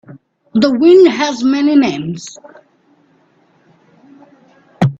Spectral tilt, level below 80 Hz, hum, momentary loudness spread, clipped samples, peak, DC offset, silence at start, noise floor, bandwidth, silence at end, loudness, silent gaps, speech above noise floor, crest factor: -6.5 dB/octave; -58 dBFS; none; 17 LU; under 0.1%; 0 dBFS; under 0.1%; 0.1 s; -53 dBFS; 7.8 kHz; 0.05 s; -12 LUFS; none; 42 dB; 14 dB